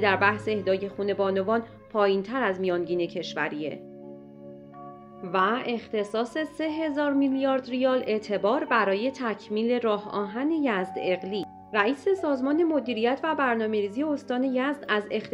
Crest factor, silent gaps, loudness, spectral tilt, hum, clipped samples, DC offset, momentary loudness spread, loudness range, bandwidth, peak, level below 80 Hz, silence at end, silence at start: 20 dB; none; -27 LUFS; -6 dB/octave; none; under 0.1%; under 0.1%; 10 LU; 5 LU; 10.5 kHz; -6 dBFS; -66 dBFS; 0 s; 0 s